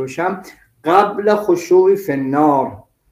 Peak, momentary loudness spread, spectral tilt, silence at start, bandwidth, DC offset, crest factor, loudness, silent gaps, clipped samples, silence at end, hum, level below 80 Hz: 0 dBFS; 11 LU; -6.5 dB/octave; 0 s; 16 kHz; under 0.1%; 16 dB; -15 LUFS; none; under 0.1%; 0.3 s; none; -58 dBFS